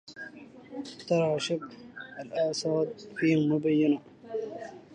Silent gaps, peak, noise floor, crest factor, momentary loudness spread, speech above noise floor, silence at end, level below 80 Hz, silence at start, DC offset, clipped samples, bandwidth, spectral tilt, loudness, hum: none; -14 dBFS; -48 dBFS; 16 dB; 18 LU; 19 dB; 0 s; -72 dBFS; 0.05 s; under 0.1%; under 0.1%; 9.8 kHz; -6 dB/octave; -29 LUFS; none